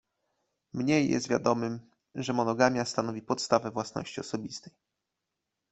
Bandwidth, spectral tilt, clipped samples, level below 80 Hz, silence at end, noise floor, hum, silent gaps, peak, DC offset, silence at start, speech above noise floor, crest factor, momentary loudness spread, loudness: 8.4 kHz; -5 dB/octave; under 0.1%; -68 dBFS; 1 s; -85 dBFS; none; none; -6 dBFS; under 0.1%; 0.75 s; 56 dB; 24 dB; 15 LU; -29 LUFS